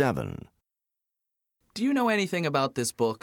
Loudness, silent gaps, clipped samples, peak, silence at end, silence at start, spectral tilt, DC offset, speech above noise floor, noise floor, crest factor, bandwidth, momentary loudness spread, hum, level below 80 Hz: -27 LUFS; none; under 0.1%; -10 dBFS; 0.05 s; 0 s; -5 dB/octave; under 0.1%; 60 dB; -87 dBFS; 18 dB; 18 kHz; 14 LU; none; -60 dBFS